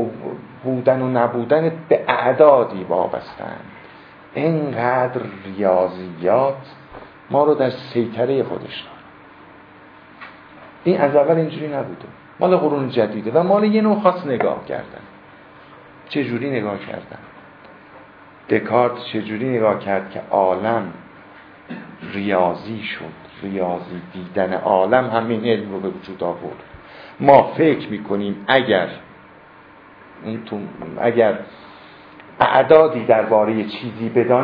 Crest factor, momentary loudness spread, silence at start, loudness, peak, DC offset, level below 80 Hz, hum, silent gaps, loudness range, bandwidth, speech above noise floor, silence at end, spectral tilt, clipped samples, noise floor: 20 dB; 19 LU; 0 s; -19 LUFS; 0 dBFS; under 0.1%; -60 dBFS; none; none; 7 LU; 5.2 kHz; 27 dB; 0 s; -9.5 dB/octave; under 0.1%; -45 dBFS